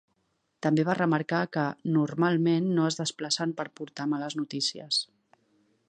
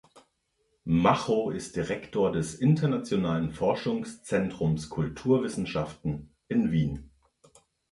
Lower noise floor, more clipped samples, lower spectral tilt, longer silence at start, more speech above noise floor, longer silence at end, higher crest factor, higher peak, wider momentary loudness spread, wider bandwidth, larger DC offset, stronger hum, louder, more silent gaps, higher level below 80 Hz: about the same, -75 dBFS vs -74 dBFS; neither; second, -5 dB/octave vs -7 dB/octave; first, 0.6 s vs 0.15 s; about the same, 48 dB vs 47 dB; about the same, 0.85 s vs 0.85 s; about the same, 18 dB vs 20 dB; about the same, -10 dBFS vs -8 dBFS; about the same, 8 LU vs 9 LU; second, 9.6 kHz vs 11.5 kHz; neither; neither; about the same, -28 LUFS vs -28 LUFS; neither; second, -76 dBFS vs -52 dBFS